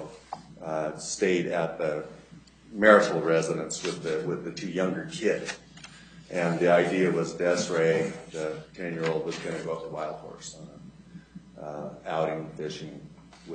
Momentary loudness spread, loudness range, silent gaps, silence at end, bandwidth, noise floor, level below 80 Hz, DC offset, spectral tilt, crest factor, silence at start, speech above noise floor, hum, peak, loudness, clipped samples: 20 LU; 10 LU; none; 0 s; 9.4 kHz; -52 dBFS; -64 dBFS; under 0.1%; -5 dB/octave; 24 dB; 0 s; 24 dB; none; -4 dBFS; -28 LUFS; under 0.1%